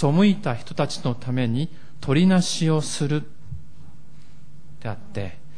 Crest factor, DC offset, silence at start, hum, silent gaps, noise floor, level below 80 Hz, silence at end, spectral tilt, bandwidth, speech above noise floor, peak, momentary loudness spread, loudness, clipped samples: 16 dB; 3%; 0 s; none; none; -49 dBFS; -54 dBFS; 0.25 s; -6 dB/octave; 10.5 kHz; 27 dB; -6 dBFS; 18 LU; -23 LUFS; under 0.1%